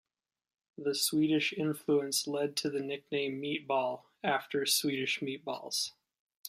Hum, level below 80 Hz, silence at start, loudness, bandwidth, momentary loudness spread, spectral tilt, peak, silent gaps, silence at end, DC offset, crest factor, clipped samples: none; -80 dBFS; 0.8 s; -32 LUFS; 15 kHz; 8 LU; -3 dB/octave; -16 dBFS; 6.19-6.29 s, 6.36-6.44 s; 0 s; under 0.1%; 18 dB; under 0.1%